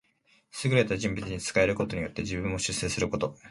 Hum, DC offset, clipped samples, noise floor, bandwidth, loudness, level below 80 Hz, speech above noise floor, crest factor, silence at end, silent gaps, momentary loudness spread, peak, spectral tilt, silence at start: none; under 0.1%; under 0.1%; -67 dBFS; 11.5 kHz; -29 LUFS; -48 dBFS; 38 dB; 20 dB; 0 s; none; 7 LU; -8 dBFS; -4.5 dB/octave; 0.55 s